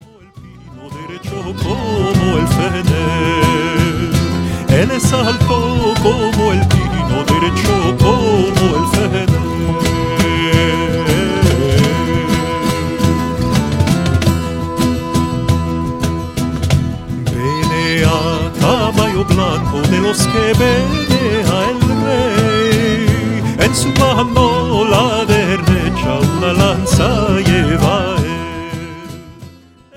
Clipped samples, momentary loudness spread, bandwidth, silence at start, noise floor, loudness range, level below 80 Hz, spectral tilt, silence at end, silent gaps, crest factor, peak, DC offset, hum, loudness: under 0.1%; 6 LU; 16.5 kHz; 0.35 s; -40 dBFS; 3 LU; -28 dBFS; -5.5 dB/octave; 0.45 s; none; 14 dB; 0 dBFS; under 0.1%; none; -14 LUFS